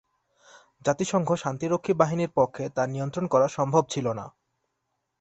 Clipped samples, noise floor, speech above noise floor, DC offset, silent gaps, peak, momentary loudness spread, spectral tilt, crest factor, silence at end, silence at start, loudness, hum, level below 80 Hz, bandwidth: under 0.1%; -79 dBFS; 54 dB; under 0.1%; none; -6 dBFS; 7 LU; -6 dB/octave; 22 dB; 0.9 s; 0.85 s; -26 LUFS; none; -64 dBFS; 8.4 kHz